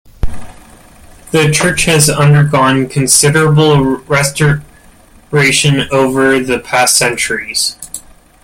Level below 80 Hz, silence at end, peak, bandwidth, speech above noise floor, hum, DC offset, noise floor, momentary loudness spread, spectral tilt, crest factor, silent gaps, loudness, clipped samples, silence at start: -32 dBFS; 0.45 s; 0 dBFS; over 20 kHz; 31 dB; none; under 0.1%; -42 dBFS; 9 LU; -4 dB/octave; 12 dB; none; -10 LUFS; under 0.1%; 0.25 s